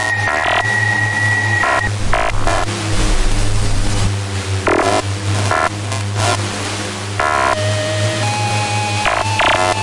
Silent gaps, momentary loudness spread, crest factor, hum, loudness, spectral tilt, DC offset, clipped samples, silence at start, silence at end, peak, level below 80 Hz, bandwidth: none; 6 LU; 12 dB; none; -16 LUFS; -4 dB/octave; under 0.1%; under 0.1%; 0 s; 0 s; -2 dBFS; -24 dBFS; 11.5 kHz